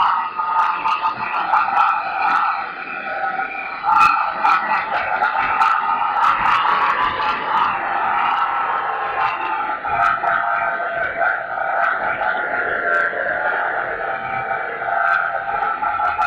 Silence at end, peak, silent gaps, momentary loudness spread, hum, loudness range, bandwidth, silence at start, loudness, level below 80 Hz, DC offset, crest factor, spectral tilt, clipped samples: 0 s; -4 dBFS; none; 7 LU; none; 3 LU; 10.5 kHz; 0 s; -18 LUFS; -54 dBFS; under 0.1%; 16 dB; -3.5 dB/octave; under 0.1%